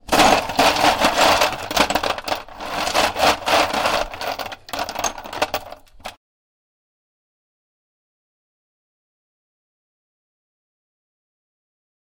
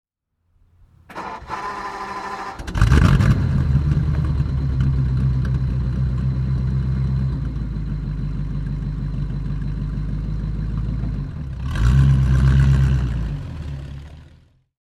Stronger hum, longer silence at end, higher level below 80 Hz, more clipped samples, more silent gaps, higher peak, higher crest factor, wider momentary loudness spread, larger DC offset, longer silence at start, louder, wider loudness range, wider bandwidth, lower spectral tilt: neither; first, 6 s vs 0.65 s; second, -44 dBFS vs -24 dBFS; neither; neither; second, -4 dBFS vs 0 dBFS; about the same, 18 dB vs 20 dB; about the same, 14 LU vs 14 LU; neither; second, 0.1 s vs 1.1 s; about the same, -19 LUFS vs -21 LUFS; first, 13 LU vs 7 LU; first, 17 kHz vs 9.2 kHz; second, -2 dB/octave vs -8 dB/octave